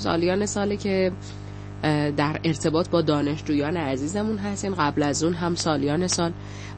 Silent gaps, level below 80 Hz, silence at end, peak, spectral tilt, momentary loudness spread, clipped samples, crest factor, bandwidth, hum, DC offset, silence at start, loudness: none; -46 dBFS; 0 s; -8 dBFS; -5 dB/octave; 6 LU; under 0.1%; 16 dB; 8.8 kHz; 50 Hz at -35 dBFS; under 0.1%; 0 s; -24 LUFS